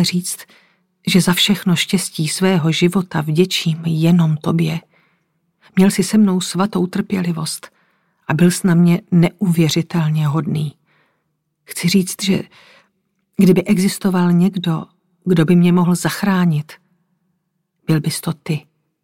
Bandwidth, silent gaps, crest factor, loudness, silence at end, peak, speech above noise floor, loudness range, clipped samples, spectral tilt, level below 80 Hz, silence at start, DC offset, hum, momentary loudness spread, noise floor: 16.5 kHz; none; 16 dB; -16 LUFS; 0.45 s; -2 dBFS; 55 dB; 3 LU; under 0.1%; -5.5 dB/octave; -54 dBFS; 0 s; under 0.1%; none; 11 LU; -70 dBFS